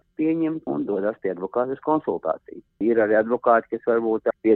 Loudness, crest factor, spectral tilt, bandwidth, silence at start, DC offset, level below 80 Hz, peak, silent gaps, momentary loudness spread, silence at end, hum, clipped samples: -23 LUFS; 18 dB; -10.5 dB/octave; 4.1 kHz; 0.2 s; under 0.1%; -64 dBFS; -6 dBFS; none; 8 LU; 0 s; none; under 0.1%